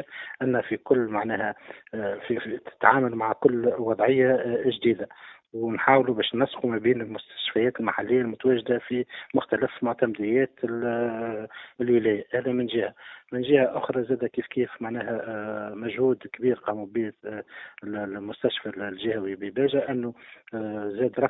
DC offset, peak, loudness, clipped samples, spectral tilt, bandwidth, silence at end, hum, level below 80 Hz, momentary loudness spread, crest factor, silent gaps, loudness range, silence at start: under 0.1%; 0 dBFS; -26 LUFS; under 0.1%; -10 dB/octave; 4 kHz; 0 s; none; -64 dBFS; 12 LU; 26 dB; none; 6 LU; 0 s